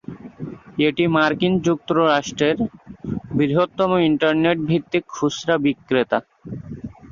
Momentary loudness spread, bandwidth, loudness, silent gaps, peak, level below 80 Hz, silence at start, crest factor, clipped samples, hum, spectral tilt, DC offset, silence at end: 17 LU; 7.4 kHz; -20 LUFS; none; -2 dBFS; -52 dBFS; 0.1 s; 18 dB; under 0.1%; none; -6 dB/octave; under 0.1%; 0 s